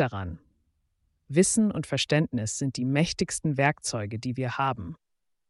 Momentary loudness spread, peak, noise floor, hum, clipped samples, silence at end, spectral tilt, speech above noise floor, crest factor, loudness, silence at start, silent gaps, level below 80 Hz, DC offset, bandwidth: 13 LU; -10 dBFS; -73 dBFS; none; under 0.1%; 0.55 s; -4.5 dB/octave; 46 dB; 18 dB; -27 LUFS; 0 s; none; -56 dBFS; under 0.1%; 11.5 kHz